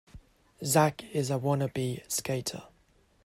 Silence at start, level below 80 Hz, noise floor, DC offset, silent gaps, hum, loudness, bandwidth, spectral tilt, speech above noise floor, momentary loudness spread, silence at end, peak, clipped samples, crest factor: 0.15 s; -62 dBFS; -65 dBFS; under 0.1%; none; none; -30 LUFS; 16 kHz; -4.5 dB/octave; 36 dB; 12 LU; 0.6 s; -10 dBFS; under 0.1%; 22 dB